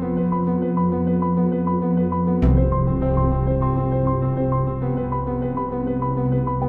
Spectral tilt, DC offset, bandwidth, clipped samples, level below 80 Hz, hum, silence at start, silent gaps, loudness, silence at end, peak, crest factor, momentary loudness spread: -13 dB/octave; under 0.1%; 3.4 kHz; under 0.1%; -28 dBFS; none; 0 s; none; -21 LUFS; 0 s; -6 dBFS; 14 dB; 5 LU